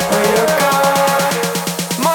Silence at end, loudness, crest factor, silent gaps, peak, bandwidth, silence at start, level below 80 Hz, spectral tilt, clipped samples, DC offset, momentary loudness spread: 0 s; -14 LUFS; 14 dB; none; 0 dBFS; 19.5 kHz; 0 s; -50 dBFS; -3.5 dB/octave; under 0.1%; under 0.1%; 6 LU